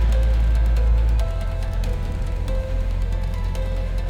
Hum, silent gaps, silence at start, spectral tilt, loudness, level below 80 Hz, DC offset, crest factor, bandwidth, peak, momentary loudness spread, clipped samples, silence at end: none; none; 0 s; -7 dB/octave; -24 LUFS; -20 dBFS; under 0.1%; 10 dB; 9 kHz; -10 dBFS; 7 LU; under 0.1%; 0 s